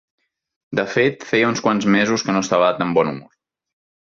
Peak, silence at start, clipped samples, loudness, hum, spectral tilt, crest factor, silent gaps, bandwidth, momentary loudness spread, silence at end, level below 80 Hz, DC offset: -4 dBFS; 0.7 s; under 0.1%; -18 LUFS; none; -5 dB/octave; 16 dB; none; 7.4 kHz; 7 LU; 0.95 s; -58 dBFS; under 0.1%